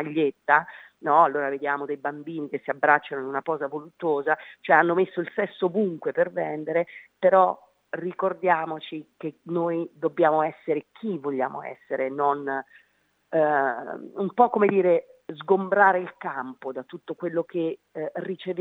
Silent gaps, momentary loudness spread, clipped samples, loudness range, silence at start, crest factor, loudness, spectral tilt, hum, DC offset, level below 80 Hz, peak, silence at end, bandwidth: none; 15 LU; under 0.1%; 4 LU; 0 s; 22 dB; -25 LUFS; -8.5 dB/octave; none; under 0.1%; -84 dBFS; -2 dBFS; 0 s; 4.2 kHz